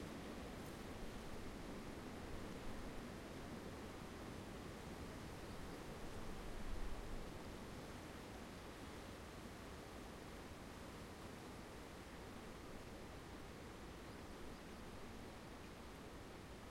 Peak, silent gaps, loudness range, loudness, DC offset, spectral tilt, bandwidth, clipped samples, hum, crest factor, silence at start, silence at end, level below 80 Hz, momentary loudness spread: -34 dBFS; none; 3 LU; -54 LUFS; under 0.1%; -5 dB/octave; 16 kHz; under 0.1%; none; 18 dB; 0 s; 0 s; -58 dBFS; 3 LU